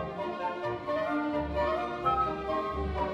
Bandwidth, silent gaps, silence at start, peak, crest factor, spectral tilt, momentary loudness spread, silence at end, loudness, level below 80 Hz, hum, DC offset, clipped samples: 12 kHz; none; 0 s; -16 dBFS; 16 dB; -7.5 dB/octave; 5 LU; 0 s; -31 LUFS; -44 dBFS; none; under 0.1%; under 0.1%